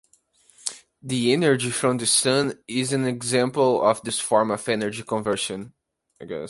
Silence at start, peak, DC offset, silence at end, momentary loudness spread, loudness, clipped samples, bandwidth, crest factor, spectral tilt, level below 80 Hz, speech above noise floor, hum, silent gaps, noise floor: 0.65 s; -2 dBFS; under 0.1%; 0 s; 13 LU; -23 LUFS; under 0.1%; 12 kHz; 22 dB; -3.5 dB/octave; -64 dBFS; 38 dB; none; none; -60 dBFS